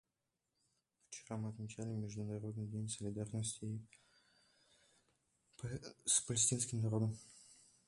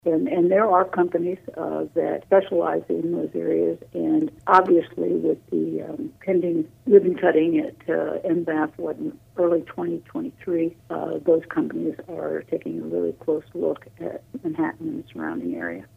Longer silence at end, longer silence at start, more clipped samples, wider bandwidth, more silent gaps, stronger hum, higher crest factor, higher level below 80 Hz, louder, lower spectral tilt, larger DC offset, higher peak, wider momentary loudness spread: first, 0.35 s vs 0.1 s; first, 1.1 s vs 0.05 s; neither; first, 11.5 kHz vs 5.6 kHz; neither; neither; about the same, 24 dB vs 20 dB; second, -70 dBFS vs -64 dBFS; second, -40 LUFS vs -23 LUFS; second, -4 dB/octave vs -8.5 dB/octave; neither; second, -20 dBFS vs -2 dBFS; first, 17 LU vs 13 LU